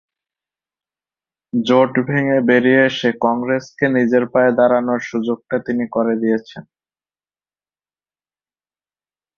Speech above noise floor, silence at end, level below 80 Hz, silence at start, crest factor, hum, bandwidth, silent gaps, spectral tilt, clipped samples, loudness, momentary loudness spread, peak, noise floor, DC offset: over 74 dB; 2.75 s; -62 dBFS; 1.55 s; 16 dB; 50 Hz at -60 dBFS; 7 kHz; none; -6.5 dB/octave; under 0.1%; -17 LUFS; 8 LU; -2 dBFS; under -90 dBFS; under 0.1%